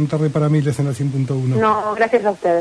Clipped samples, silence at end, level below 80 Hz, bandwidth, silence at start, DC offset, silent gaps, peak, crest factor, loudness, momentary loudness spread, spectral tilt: under 0.1%; 0 s; -54 dBFS; 11 kHz; 0 s; under 0.1%; none; -4 dBFS; 14 dB; -18 LUFS; 4 LU; -7.5 dB/octave